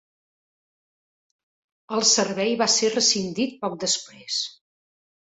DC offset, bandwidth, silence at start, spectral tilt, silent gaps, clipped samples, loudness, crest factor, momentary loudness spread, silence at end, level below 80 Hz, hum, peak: under 0.1%; 8.4 kHz; 1.9 s; -1.5 dB/octave; none; under 0.1%; -22 LUFS; 22 dB; 9 LU; 0.9 s; -68 dBFS; none; -4 dBFS